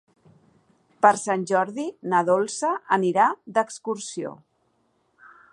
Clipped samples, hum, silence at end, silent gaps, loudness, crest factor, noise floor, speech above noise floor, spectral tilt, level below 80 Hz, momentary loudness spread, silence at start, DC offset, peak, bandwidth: under 0.1%; none; 1.2 s; none; -23 LUFS; 22 dB; -68 dBFS; 45 dB; -4.5 dB/octave; -78 dBFS; 12 LU; 1 s; under 0.1%; -2 dBFS; 11.5 kHz